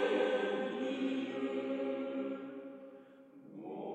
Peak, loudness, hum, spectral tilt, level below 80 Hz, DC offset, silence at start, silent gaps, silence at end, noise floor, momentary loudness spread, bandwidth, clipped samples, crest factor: -20 dBFS; -37 LUFS; none; -5.5 dB/octave; -90 dBFS; under 0.1%; 0 s; none; 0 s; -57 dBFS; 21 LU; 8.8 kHz; under 0.1%; 16 dB